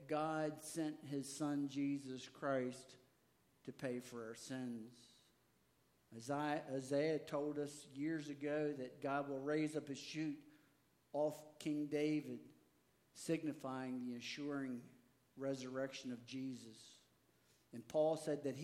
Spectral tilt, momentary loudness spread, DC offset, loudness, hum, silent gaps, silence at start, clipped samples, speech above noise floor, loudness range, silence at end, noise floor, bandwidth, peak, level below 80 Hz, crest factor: -5.5 dB/octave; 14 LU; under 0.1%; -44 LUFS; none; none; 0 s; under 0.1%; 34 dB; 6 LU; 0 s; -77 dBFS; 16 kHz; -26 dBFS; -88 dBFS; 18 dB